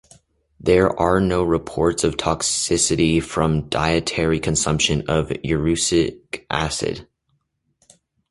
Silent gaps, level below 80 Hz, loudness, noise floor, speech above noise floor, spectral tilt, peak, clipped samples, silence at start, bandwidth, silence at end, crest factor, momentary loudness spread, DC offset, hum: none; -38 dBFS; -20 LUFS; -70 dBFS; 50 dB; -4 dB/octave; -2 dBFS; under 0.1%; 0.6 s; 11.5 kHz; 1.3 s; 18 dB; 7 LU; under 0.1%; none